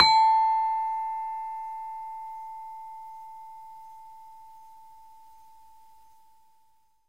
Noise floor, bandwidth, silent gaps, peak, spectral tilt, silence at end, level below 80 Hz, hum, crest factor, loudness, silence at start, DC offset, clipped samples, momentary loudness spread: -67 dBFS; 11 kHz; none; -2 dBFS; -1 dB/octave; 2.4 s; -68 dBFS; none; 28 dB; -27 LUFS; 0 s; 0.2%; under 0.1%; 27 LU